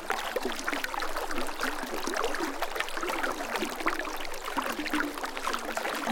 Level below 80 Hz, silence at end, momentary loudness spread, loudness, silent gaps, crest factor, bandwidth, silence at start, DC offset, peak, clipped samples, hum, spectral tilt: -44 dBFS; 0 s; 3 LU; -32 LUFS; none; 24 dB; 17 kHz; 0 s; under 0.1%; -8 dBFS; under 0.1%; none; -2 dB/octave